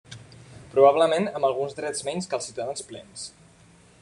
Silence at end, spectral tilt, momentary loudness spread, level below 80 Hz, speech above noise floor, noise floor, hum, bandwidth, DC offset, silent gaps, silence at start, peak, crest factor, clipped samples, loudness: 0.75 s; -4 dB/octave; 22 LU; -64 dBFS; 30 dB; -54 dBFS; none; 11.5 kHz; under 0.1%; none; 0.1 s; -4 dBFS; 22 dB; under 0.1%; -24 LUFS